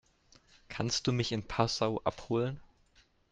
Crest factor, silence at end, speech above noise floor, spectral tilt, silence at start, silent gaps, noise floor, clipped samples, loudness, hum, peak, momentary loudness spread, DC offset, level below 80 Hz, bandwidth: 24 dB; 0.7 s; 34 dB; -5 dB/octave; 0.7 s; none; -67 dBFS; under 0.1%; -33 LUFS; none; -12 dBFS; 7 LU; under 0.1%; -58 dBFS; 9.4 kHz